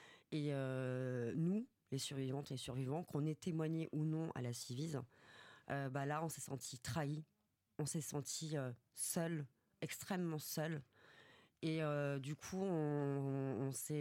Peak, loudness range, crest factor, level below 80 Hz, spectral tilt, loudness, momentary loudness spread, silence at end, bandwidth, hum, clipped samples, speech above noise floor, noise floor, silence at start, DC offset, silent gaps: -28 dBFS; 2 LU; 16 dB; -80 dBFS; -5.5 dB/octave; -43 LUFS; 8 LU; 0 s; 16.5 kHz; none; under 0.1%; 24 dB; -67 dBFS; 0 s; under 0.1%; none